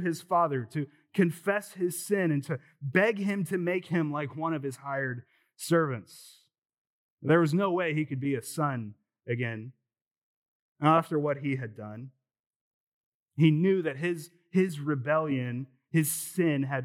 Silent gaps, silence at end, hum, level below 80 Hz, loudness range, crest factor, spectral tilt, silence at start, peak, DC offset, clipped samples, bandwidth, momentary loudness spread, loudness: 6.58-6.69 s, 6.78-7.17 s, 10.01-10.75 s, 12.40-12.50 s, 12.56-13.26 s; 0 s; none; -86 dBFS; 3 LU; 22 dB; -6 dB/octave; 0 s; -8 dBFS; under 0.1%; under 0.1%; 16.5 kHz; 14 LU; -29 LUFS